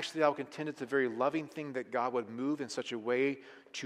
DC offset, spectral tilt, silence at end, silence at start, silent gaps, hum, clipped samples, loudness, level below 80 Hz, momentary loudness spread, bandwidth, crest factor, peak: under 0.1%; -4.5 dB/octave; 0 s; 0 s; none; none; under 0.1%; -35 LUFS; -86 dBFS; 9 LU; 13 kHz; 20 dB; -16 dBFS